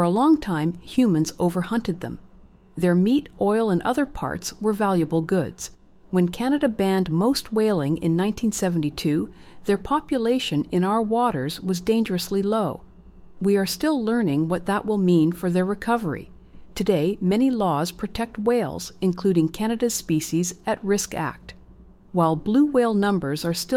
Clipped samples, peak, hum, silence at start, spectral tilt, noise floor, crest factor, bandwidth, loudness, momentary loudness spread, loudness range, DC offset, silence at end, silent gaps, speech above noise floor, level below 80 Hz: under 0.1%; -8 dBFS; none; 0 s; -6 dB/octave; -48 dBFS; 16 dB; 16.5 kHz; -23 LUFS; 9 LU; 1 LU; under 0.1%; 0 s; none; 26 dB; -48 dBFS